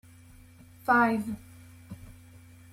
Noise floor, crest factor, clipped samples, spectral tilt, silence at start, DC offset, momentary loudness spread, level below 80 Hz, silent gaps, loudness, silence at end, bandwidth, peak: -53 dBFS; 20 dB; under 0.1%; -6.5 dB/octave; 0.85 s; under 0.1%; 24 LU; -60 dBFS; none; -27 LUFS; 0.6 s; 16 kHz; -12 dBFS